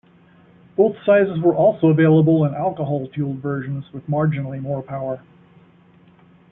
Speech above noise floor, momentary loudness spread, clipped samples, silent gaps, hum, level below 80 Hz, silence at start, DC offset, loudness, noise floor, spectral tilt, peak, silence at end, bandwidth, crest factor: 33 dB; 14 LU; under 0.1%; none; none; -58 dBFS; 0.8 s; under 0.1%; -19 LUFS; -51 dBFS; -12.5 dB/octave; -4 dBFS; 1.35 s; 3.8 kHz; 16 dB